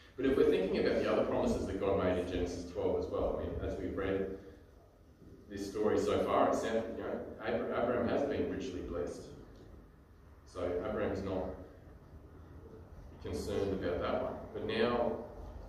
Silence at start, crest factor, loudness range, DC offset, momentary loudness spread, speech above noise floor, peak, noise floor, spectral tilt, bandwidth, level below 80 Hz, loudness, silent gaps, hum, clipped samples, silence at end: 0 s; 20 dB; 7 LU; under 0.1%; 22 LU; 25 dB; -16 dBFS; -60 dBFS; -6.5 dB/octave; 14.5 kHz; -52 dBFS; -35 LUFS; none; none; under 0.1%; 0 s